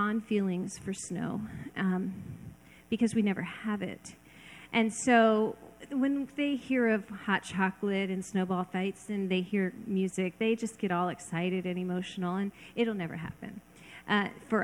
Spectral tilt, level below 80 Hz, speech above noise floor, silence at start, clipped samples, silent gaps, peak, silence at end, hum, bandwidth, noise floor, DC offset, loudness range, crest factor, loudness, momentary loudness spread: -5.5 dB/octave; -66 dBFS; 21 dB; 0 s; under 0.1%; none; -12 dBFS; 0 s; none; 12.5 kHz; -52 dBFS; under 0.1%; 5 LU; 20 dB; -31 LUFS; 15 LU